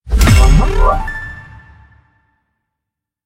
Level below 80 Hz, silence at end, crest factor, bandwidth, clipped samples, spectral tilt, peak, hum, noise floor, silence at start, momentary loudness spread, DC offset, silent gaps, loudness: -14 dBFS; 1.85 s; 14 dB; 16.5 kHz; under 0.1%; -5.5 dB/octave; 0 dBFS; none; -80 dBFS; 0.05 s; 19 LU; under 0.1%; none; -12 LUFS